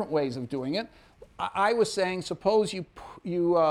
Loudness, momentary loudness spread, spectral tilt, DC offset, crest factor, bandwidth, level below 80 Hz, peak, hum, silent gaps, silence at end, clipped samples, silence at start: -28 LUFS; 13 LU; -5 dB/octave; under 0.1%; 16 dB; 12.5 kHz; -60 dBFS; -12 dBFS; none; none; 0 s; under 0.1%; 0 s